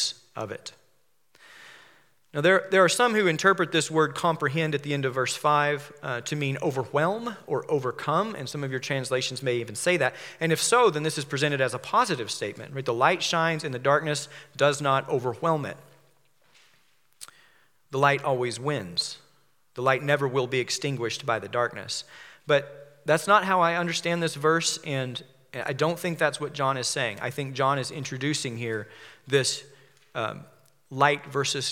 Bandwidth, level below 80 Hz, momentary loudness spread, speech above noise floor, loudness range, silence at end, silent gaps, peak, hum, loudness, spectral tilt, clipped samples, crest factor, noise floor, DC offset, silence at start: 16.5 kHz; -78 dBFS; 13 LU; 44 dB; 5 LU; 0 s; none; -6 dBFS; none; -26 LUFS; -4 dB/octave; under 0.1%; 22 dB; -70 dBFS; under 0.1%; 0 s